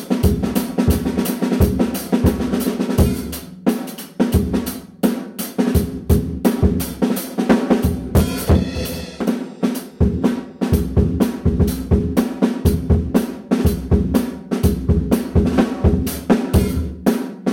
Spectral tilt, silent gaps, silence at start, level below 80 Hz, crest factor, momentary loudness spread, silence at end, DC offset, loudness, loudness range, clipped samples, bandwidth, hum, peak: -7 dB/octave; none; 0 s; -28 dBFS; 14 dB; 6 LU; 0 s; under 0.1%; -19 LUFS; 2 LU; under 0.1%; 17 kHz; none; -4 dBFS